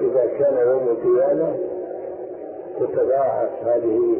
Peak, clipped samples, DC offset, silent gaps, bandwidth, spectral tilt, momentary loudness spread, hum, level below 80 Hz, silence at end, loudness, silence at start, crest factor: -10 dBFS; under 0.1%; under 0.1%; none; 2.9 kHz; -13 dB/octave; 14 LU; none; -62 dBFS; 0 s; -20 LUFS; 0 s; 10 dB